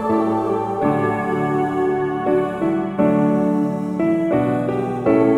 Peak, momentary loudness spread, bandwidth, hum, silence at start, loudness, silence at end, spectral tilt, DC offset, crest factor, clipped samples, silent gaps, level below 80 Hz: -4 dBFS; 4 LU; 11.5 kHz; none; 0 s; -19 LUFS; 0 s; -9 dB/octave; under 0.1%; 14 dB; under 0.1%; none; -52 dBFS